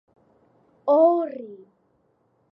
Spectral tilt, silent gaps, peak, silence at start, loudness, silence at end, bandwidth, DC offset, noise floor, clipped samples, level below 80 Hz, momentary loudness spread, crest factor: -8.5 dB/octave; none; -8 dBFS; 0.85 s; -21 LUFS; 0.95 s; 5.4 kHz; under 0.1%; -67 dBFS; under 0.1%; -84 dBFS; 21 LU; 18 dB